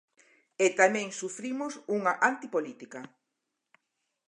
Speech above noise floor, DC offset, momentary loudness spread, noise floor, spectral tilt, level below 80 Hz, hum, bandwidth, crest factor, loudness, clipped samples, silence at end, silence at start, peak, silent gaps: 55 dB; under 0.1%; 18 LU; -84 dBFS; -3.5 dB/octave; -86 dBFS; none; 11 kHz; 22 dB; -29 LUFS; under 0.1%; 1.25 s; 0.6 s; -8 dBFS; none